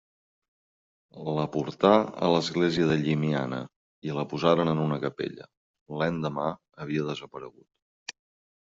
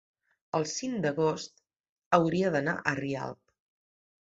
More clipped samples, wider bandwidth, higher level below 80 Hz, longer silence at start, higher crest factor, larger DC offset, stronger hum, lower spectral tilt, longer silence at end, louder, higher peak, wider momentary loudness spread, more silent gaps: neither; about the same, 7.8 kHz vs 8 kHz; first, -62 dBFS vs -68 dBFS; first, 1.15 s vs 0.55 s; about the same, 24 dB vs 26 dB; neither; neither; about the same, -5.5 dB/octave vs -5 dB/octave; second, 0.6 s vs 0.95 s; first, -27 LUFS vs -30 LUFS; about the same, -6 dBFS vs -6 dBFS; first, 19 LU vs 11 LU; first, 3.76-4.02 s, 5.57-5.74 s, 5.81-5.86 s, 7.82-8.06 s vs 1.76-2.11 s